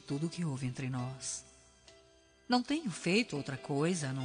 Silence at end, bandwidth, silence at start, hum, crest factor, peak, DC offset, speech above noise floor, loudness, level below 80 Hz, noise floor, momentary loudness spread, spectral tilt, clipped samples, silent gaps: 0 s; 10 kHz; 0.05 s; none; 20 dB; -16 dBFS; under 0.1%; 29 dB; -35 LUFS; -68 dBFS; -64 dBFS; 8 LU; -5 dB/octave; under 0.1%; none